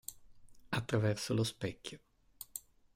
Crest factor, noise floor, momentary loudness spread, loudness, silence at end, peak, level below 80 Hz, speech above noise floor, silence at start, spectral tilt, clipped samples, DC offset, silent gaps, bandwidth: 18 dB; -56 dBFS; 16 LU; -37 LUFS; 0.35 s; -20 dBFS; -66 dBFS; 21 dB; 0.1 s; -5 dB/octave; under 0.1%; under 0.1%; none; 16 kHz